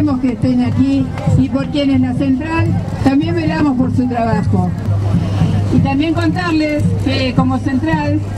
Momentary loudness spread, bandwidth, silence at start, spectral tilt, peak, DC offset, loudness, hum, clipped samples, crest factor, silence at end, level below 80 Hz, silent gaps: 2 LU; 11 kHz; 0 s; -8 dB/octave; 0 dBFS; under 0.1%; -15 LUFS; none; under 0.1%; 14 dB; 0 s; -32 dBFS; none